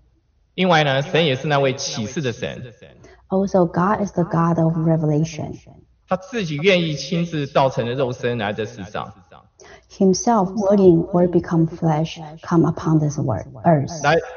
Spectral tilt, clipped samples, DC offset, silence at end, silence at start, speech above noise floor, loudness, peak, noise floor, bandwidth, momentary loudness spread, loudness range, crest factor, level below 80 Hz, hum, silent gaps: -5.5 dB/octave; under 0.1%; under 0.1%; 0 s; 0.55 s; 41 dB; -19 LUFS; -2 dBFS; -60 dBFS; 7 kHz; 12 LU; 4 LU; 18 dB; -50 dBFS; none; none